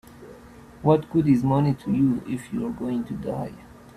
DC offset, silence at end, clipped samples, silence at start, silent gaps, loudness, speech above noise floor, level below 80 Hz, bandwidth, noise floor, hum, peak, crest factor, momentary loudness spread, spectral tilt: under 0.1%; 0.3 s; under 0.1%; 0.15 s; none; -24 LUFS; 23 dB; -52 dBFS; 13.5 kHz; -46 dBFS; none; -6 dBFS; 18 dB; 10 LU; -9 dB/octave